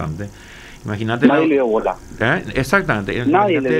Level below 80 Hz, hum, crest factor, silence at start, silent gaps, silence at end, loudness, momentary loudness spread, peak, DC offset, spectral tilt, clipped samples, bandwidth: -40 dBFS; none; 16 dB; 0 s; none; 0 s; -17 LUFS; 18 LU; 0 dBFS; under 0.1%; -6.5 dB/octave; under 0.1%; 15 kHz